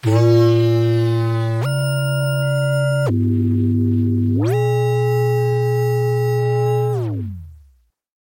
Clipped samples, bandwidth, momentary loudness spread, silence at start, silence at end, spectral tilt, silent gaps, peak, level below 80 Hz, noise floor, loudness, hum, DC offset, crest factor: under 0.1%; 16.5 kHz; 5 LU; 0.05 s; 0.7 s; -7.5 dB/octave; none; -4 dBFS; -52 dBFS; -55 dBFS; -18 LUFS; none; under 0.1%; 14 dB